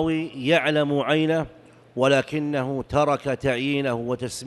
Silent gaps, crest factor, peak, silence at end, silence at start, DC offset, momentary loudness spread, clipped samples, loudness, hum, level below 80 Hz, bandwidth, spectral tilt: none; 16 dB; -6 dBFS; 0 s; 0 s; under 0.1%; 7 LU; under 0.1%; -23 LUFS; none; -52 dBFS; 12 kHz; -5.5 dB/octave